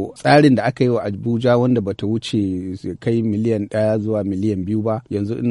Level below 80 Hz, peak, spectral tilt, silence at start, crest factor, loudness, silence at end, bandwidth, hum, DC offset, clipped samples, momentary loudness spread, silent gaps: -54 dBFS; -2 dBFS; -7.5 dB/octave; 0 s; 16 dB; -19 LUFS; 0 s; 11.5 kHz; none; under 0.1%; under 0.1%; 9 LU; none